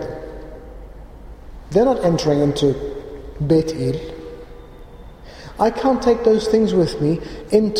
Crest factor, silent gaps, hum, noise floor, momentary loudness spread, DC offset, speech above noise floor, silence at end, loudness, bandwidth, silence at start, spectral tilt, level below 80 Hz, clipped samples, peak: 16 dB; none; none; -39 dBFS; 21 LU; under 0.1%; 22 dB; 0 s; -18 LUFS; 14.5 kHz; 0 s; -7 dB/octave; -38 dBFS; under 0.1%; -4 dBFS